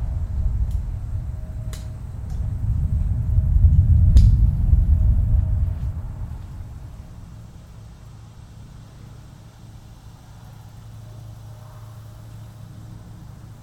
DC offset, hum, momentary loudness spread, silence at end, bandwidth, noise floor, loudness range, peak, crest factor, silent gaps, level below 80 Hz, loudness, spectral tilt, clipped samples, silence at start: under 0.1%; none; 26 LU; 0 s; 8.6 kHz; -42 dBFS; 24 LU; -4 dBFS; 18 dB; none; -24 dBFS; -22 LUFS; -8.5 dB/octave; under 0.1%; 0 s